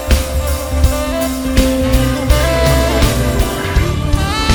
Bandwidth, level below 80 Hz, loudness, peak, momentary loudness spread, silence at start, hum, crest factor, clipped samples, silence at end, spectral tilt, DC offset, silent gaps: over 20 kHz; -16 dBFS; -15 LUFS; 0 dBFS; 5 LU; 0 s; none; 14 dB; under 0.1%; 0 s; -5 dB/octave; under 0.1%; none